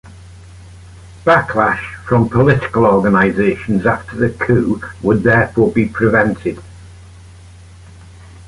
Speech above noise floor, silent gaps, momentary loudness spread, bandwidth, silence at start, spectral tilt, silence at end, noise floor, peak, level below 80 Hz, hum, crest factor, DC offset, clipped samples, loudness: 25 dB; none; 8 LU; 11.5 kHz; 0.05 s; -8 dB/octave; 0.05 s; -38 dBFS; 0 dBFS; -38 dBFS; none; 14 dB; under 0.1%; under 0.1%; -14 LUFS